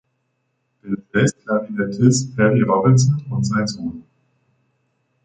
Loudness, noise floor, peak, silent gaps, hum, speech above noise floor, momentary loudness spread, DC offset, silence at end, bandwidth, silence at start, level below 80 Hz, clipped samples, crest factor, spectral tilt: -18 LUFS; -70 dBFS; -2 dBFS; none; none; 53 dB; 14 LU; under 0.1%; 1.25 s; 9.4 kHz; 0.85 s; -52 dBFS; under 0.1%; 18 dB; -6 dB/octave